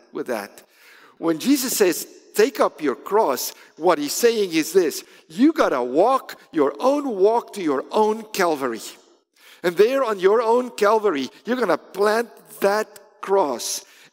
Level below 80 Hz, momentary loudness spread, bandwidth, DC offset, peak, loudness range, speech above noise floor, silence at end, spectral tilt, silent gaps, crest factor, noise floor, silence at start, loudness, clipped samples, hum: -70 dBFS; 10 LU; 16.5 kHz; under 0.1%; -4 dBFS; 2 LU; 33 dB; 0.3 s; -3.5 dB/octave; none; 18 dB; -53 dBFS; 0.15 s; -21 LUFS; under 0.1%; none